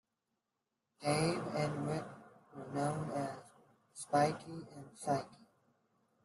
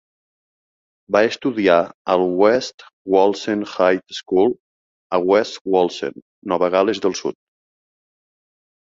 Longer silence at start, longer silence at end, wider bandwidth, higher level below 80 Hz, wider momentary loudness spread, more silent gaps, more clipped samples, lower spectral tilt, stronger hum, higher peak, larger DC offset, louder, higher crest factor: about the same, 1 s vs 1.1 s; second, 0.9 s vs 1.6 s; first, 12 kHz vs 7.8 kHz; second, -74 dBFS vs -62 dBFS; first, 20 LU vs 12 LU; second, none vs 1.94-2.05 s, 2.74-2.78 s, 2.93-3.05 s, 4.60-5.10 s, 5.61-5.65 s, 6.22-6.42 s; neither; about the same, -5.5 dB/octave vs -5 dB/octave; neither; second, -20 dBFS vs -2 dBFS; neither; second, -37 LUFS vs -19 LUFS; about the same, 20 dB vs 18 dB